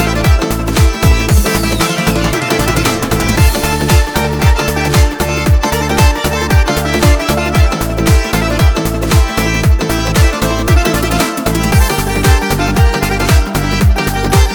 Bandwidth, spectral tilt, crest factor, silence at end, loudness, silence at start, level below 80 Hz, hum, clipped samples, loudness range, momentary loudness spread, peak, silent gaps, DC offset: over 20 kHz; -5 dB/octave; 10 dB; 0 s; -12 LUFS; 0 s; -14 dBFS; none; under 0.1%; 0 LU; 3 LU; 0 dBFS; none; 0.2%